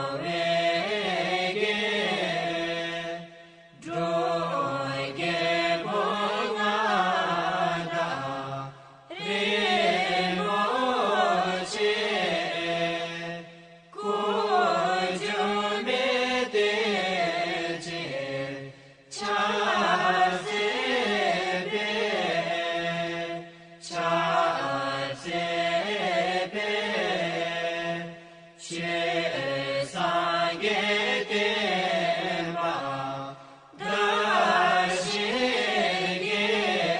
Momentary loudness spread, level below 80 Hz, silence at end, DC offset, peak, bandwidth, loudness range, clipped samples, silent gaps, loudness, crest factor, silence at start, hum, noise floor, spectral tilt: 10 LU; -66 dBFS; 0 s; under 0.1%; -10 dBFS; 10 kHz; 3 LU; under 0.1%; none; -26 LUFS; 18 dB; 0 s; none; -50 dBFS; -4 dB/octave